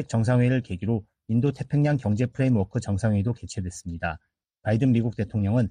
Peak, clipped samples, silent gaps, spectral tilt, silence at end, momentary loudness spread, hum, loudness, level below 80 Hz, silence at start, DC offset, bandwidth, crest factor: -12 dBFS; under 0.1%; none; -8 dB/octave; 0 s; 10 LU; none; -25 LUFS; -50 dBFS; 0 s; under 0.1%; 10 kHz; 12 dB